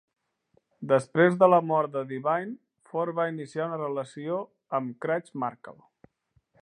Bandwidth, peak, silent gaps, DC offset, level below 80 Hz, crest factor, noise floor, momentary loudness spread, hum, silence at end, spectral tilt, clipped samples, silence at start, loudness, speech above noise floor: 10.5 kHz; -6 dBFS; none; under 0.1%; -78 dBFS; 22 dB; -70 dBFS; 14 LU; none; 0.9 s; -7.5 dB/octave; under 0.1%; 0.8 s; -27 LUFS; 44 dB